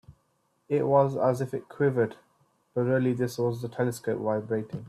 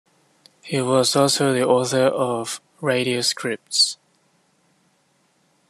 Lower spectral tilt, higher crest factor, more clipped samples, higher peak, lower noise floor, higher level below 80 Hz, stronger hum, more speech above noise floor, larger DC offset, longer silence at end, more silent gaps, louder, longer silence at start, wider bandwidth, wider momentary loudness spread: first, -7.5 dB/octave vs -3.5 dB/octave; about the same, 18 dB vs 20 dB; neither; second, -10 dBFS vs -4 dBFS; first, -72 dBFS vs -64 dBFS; about the same, -66 dBFS vs -70 dBFS; neither; about the same, 45 dB vs 44 dB; neither; second, 0 s vs 1.75 s; neither; second, -28 LUFS vs -20 LUFS; second, 0.1 s vs 0.65 s; about the same, 14 kHz vs 13 kHz; about the same, 8 LU vs 10 LU